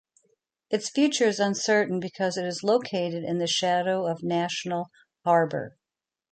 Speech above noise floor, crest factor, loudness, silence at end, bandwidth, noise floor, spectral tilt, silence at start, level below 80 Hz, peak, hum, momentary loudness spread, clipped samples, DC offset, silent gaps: 64 dB; 18 dB; -26 LUFS; 0.65 s; 9.4 kHz; -89 dBFS; -4 dB/octave; 0.7 s; -74 dBFS; -10 dBFS; none; 9 LU; under 0.1%; under 0.1%; none